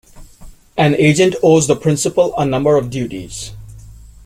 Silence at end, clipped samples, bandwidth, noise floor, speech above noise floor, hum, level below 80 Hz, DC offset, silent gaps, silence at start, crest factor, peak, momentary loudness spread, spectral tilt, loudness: 0.3 s; under 0.1%; 15.5 kHz; -38 dBFS; 25 dB; none; -42 dBFS; under 0.1%; none; 0.15 s; 14 dB; -2 dBFS; 15 LU; -5.5 dB/octave; -14 LUFS